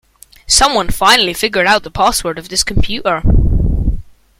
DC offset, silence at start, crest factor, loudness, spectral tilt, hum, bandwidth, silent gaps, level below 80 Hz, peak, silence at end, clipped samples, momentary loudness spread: under 0.1%; 0.5 s; 14 dB; -13 LUFS; -3 dB/octave; none; 16.5 kHz; none; -20 dBFS; 0 dBFS; 0.35 s; under 0.1%; 8 LU